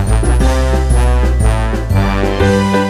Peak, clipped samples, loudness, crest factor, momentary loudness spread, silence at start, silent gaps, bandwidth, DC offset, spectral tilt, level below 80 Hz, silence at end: 0 dBFS; under 0.1%; -13 LUFS; 12 dB; 3 LU; 0 s; none; 13 kHz; under 0.1%; -6.5 dB/octave; -14 dBFS; 0 s